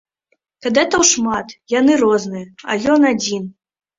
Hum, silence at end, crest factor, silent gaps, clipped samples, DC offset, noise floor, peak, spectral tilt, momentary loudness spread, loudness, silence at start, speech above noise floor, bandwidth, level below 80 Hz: none; 0.5 s; 16 dB; none; under 0.1%; under 0.1%; -67 dBFS; -2 dBFS; -3 dB/octave; 14 LU; -16 LUFS; 0.65 s; 51 dB; 7.8 kHz; -54 dBFS